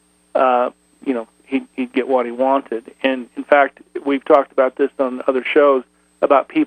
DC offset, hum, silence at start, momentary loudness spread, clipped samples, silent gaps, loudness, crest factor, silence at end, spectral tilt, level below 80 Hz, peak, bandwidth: under 0.1%; none; 0.35 s; 10 LU; under 0.1%; none; -18 LUFS; 18 dB; 0 s; -5.5 dB/octave; -66 dBFS; 0 dBFS; 9.2 kHz